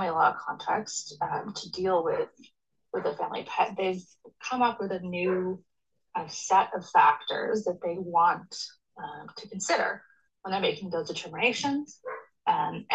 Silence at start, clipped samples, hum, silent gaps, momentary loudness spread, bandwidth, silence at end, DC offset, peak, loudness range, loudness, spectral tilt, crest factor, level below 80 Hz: 0 s; under 0.1%; none; none; 15 LU; 9.2 kHz; 0 s; under 0.1%; -10 dBFS; 5 LU; -29 LUFS; -3.5 dB/octave; 20 dB; -72 dBFS